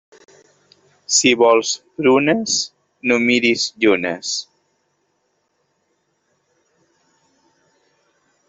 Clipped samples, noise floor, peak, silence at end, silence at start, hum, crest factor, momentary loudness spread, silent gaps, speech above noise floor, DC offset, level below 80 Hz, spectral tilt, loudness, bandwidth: under 0.1%; -68 dBFS; -2 dBFS; 4.05 s; 1.1 s; none; 18 dB; 11 LU; none; 51 dB; under 0.1%; -64 dBFS; -2.5 dB/octave; -16 LUFS; 8.2 kHz